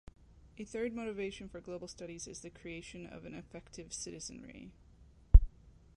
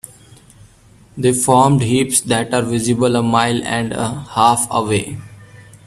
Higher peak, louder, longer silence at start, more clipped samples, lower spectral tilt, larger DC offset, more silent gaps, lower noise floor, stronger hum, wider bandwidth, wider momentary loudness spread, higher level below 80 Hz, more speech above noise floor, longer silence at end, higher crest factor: second, -6 dBFS vs 0 dBFS; second, -38 LUFS vs -16 LUFS; second, 0.6 s vs 1.15 s; neither; about the same, -5.5 dB/octave vs -4.5 dB/octave; neither; neither; first, -61 dBFS vs -47 dBFS; neither; second, 11 kHz vs 15 kHz; first, 22 LU vs 10 LU; first, -36 dBFS vs -48 dBFS; second, 16 dB vs 31 dB; first, 0.5 s vs 0.25 s; first, 28 dB vs 16 dB